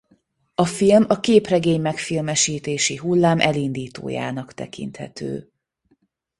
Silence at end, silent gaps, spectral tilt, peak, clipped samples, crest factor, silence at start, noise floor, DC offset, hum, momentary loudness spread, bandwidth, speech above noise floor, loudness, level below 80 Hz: 1 s; none; -4.5 dB/octave; -2 dBFS; under 0.1%; 20 dB; 0.6 s; -65 dBFS; under 0.1%; none; 16 LU; 11.5 kHz; 45 dB; -20 LUFS; -56 dBFS